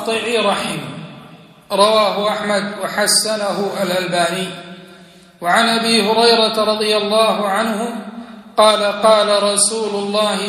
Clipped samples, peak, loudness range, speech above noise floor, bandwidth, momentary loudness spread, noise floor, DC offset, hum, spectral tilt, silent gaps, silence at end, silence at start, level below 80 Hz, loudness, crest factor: under 0.1%; 0 dBFS; 3 LU; 27 dB; 14.5 kHz; 14 LU; -43 dBFS; under 0.1%; none; -2.5 dB/octave; none; 0 s; 0 s; -62 dBFS; -15 LUFS; 16 dB